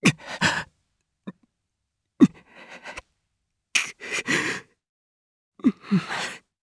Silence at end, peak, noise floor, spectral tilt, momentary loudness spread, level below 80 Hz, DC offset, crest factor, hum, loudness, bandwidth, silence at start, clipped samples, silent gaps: 0.25 s; -4 dBFS; -80 dBFS; -4 dB/octave; 23 LU; -62 dBFS; under 0.1%; 24 dB; none; -25 LUFS; 11 kHz; 0 s; under 0.1%; 4.89-5.52 s